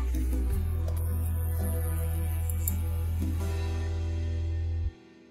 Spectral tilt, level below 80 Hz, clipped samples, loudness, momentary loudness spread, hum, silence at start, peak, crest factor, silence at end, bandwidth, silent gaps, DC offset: -6.5 dB/octave; -32 dBFS; under 0.1%; -31 LUFS; 2 LU; none; 0 s; -12 dBFS; 18 dB; 0.05 s; 16.5 kHz; none; under 0.1%